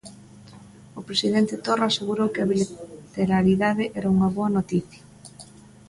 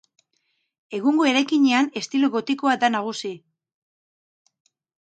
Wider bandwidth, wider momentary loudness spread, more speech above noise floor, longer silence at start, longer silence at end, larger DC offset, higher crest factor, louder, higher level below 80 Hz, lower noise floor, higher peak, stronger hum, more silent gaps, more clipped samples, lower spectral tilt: first, 11.5 kHz vs 9 kHz; first, 19 LU vs 14 LU; second, 24 dB vs 51 dB; second, 0.05 s vs 0.9 s; second, 0.45 s vs 1.65 s; neither; about the same, 16 dB vs 18 dB; about the same, -23 LUFS vs -21 LUFS; first, -54 dBFS vs -78 dBFS; second, -47 dBFS vs -72 dBFS; about the same, -8 dBFS vs -6 dBFS; neither; neither; neither; first, -6 dB/octave vs -3.5 dB/octave